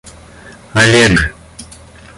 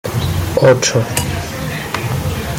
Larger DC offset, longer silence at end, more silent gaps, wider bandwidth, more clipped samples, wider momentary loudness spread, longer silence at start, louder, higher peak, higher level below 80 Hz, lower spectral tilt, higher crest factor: neither; first, 0.55 s vs 0 s; neither; second, 11.5 kHz vs 17 kHz; neither; first, 26 LU vs 11 LU; first, 0.45 s vs 0.05 s; first, -11 LUFS vs -16 LUFS; about the same, 0 dBFS vs 0 dBFS; about the same, -32 dBFS vs -34 dBFS; about the same, -4 dB/octave vs -4.5 dB/octave; about the same, 14 dB vs 16 dB